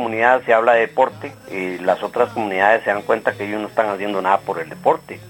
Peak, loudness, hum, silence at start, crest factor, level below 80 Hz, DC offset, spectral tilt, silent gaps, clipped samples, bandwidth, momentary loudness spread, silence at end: 0 dBFS; -18 LUFS; none; 0 s; 18 dB; -62 dBFS; under 0.1%; -5.5 dB/octave; none; under 0.1%; 16.5 kHz; 11 LU; 0 s